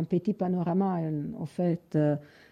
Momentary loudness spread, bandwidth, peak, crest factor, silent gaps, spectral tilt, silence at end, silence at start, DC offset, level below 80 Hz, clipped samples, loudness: 7 LU; 9.2 kHz; -16 dBFS; 14 dB; none; -10 dB/octave; 0.25 s; 0 s; under 0.1%; -66 dBFS; under 0.1%; -29 LUFS